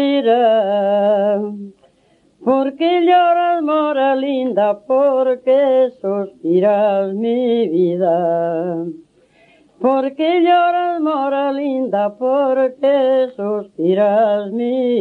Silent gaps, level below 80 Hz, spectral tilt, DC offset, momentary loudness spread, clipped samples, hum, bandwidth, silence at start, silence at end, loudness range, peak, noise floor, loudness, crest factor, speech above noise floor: none; -70 dBFS; -8 dB/octave; under 0.1%; 7 LU; under 0.1%; none; 4.5 kHz; 0 s; 0 s; 2 LU; -2 dBFS; -56 dBFS; -16 LUFS; 14 dB; 40 dB